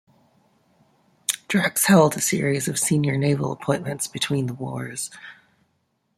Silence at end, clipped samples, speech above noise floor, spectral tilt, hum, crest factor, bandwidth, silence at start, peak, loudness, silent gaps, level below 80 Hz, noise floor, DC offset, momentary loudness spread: 0.85 s; under 0.1%; 49 dB; -4.5 dB/octave; none; 22 dB; 16 kHz; 1.3 s; -2 dBFS; -22 LUFS; none; -62 dBFS; -70 dBFS; under 0.1%; 14 LU